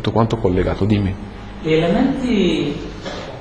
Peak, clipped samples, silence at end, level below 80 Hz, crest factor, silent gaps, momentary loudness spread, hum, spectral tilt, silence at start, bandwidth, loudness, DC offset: -2 dBFS; under 0.1%; 0 s; -34 dBFS; 16 dB; none; 12 LU; none; -7.5 dB/octave; 0 s; 10 kHz; -19 LUFS; under 0.1%